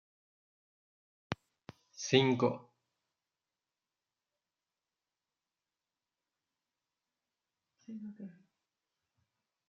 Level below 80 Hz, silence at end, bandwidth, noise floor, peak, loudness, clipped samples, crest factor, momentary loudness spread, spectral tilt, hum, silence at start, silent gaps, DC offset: -80 dBFS; 1.35 s; 7.2 kHz; under -90 dBFS; -12 dBFS; -33 LUFS; under 0.1%; 30 dB; 23 LU; -5 dB/octave; none; 1.3 s; none; under 0.1%